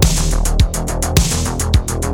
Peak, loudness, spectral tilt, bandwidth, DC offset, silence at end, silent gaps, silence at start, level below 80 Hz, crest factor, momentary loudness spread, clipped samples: 0 dBFS; -17 LUFS; -4 dB/octave; over 20 kHz; under 0.1%; 0 s; none; 0 s; -18 dBFS; 14 dB; 3 LU; under 0.1%